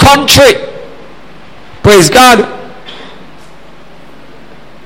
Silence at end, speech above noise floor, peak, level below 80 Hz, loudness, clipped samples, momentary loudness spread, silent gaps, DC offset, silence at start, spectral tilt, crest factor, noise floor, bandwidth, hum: 1.9 s; 31 dB; 0 dBFS; -30 dBFS; -5 LUFS; 1%; 25 LU; none; 3%; 0 s; -3.5 dB/octave; 10 dB; -36 dBFS; over 20 kHz; none